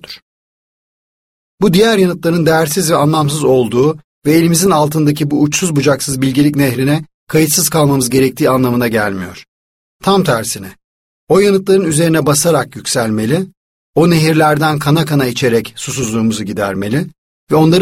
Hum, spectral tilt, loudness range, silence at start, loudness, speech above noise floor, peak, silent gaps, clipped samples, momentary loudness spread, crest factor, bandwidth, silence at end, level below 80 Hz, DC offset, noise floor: none; -5 dB/octave; 3 LU; 0.1 s; -13 LUFS; over 78 dB; 0 dBFS; 0.22-1.58 s, 4.04-4.22 s, 7.14-7.27 s, 9.48-10.00 s, 10.84-11.27 s, 13.57-13.93 s, 17.18-17.47 s; under 0.1%; 8 LU; 12 dB; 16.5 kHz; 0 s; -46 dBFS; under 0.1%; under -90 dBFS